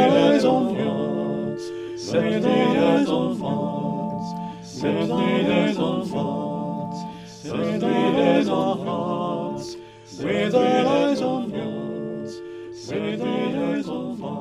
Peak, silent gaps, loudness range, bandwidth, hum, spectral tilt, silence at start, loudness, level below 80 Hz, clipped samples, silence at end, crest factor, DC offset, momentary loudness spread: -4 dBFS; none; 2 LU; 12 kHz; none; -6.5 dB/octave; 0 s; -23 LUFS; -60 dBFS; under 0.1%; 0 s; 18 dB; under 0.1%; 13 LU